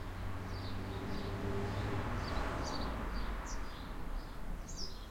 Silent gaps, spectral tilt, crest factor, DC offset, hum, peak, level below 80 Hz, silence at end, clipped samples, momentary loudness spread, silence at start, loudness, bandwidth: none; -5.5 dB/octave; 14 dB; under 0.1%; none; -24 dBFS; -44 dBFS; 0 s; under 0.1%; 8 LU; 0 s; -42 LUFS; 16.5 kHz